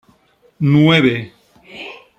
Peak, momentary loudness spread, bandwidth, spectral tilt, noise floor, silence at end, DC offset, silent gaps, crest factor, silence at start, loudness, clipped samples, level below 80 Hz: -2 dBFS; 22 LU; 8.4 kHz; -7.5 dB/octave; -55 dBFS; 0.25 s; under 0.1%; none; 16 dB; 0.6 s; -14 LUFS; under 0.1%; -54 dBFS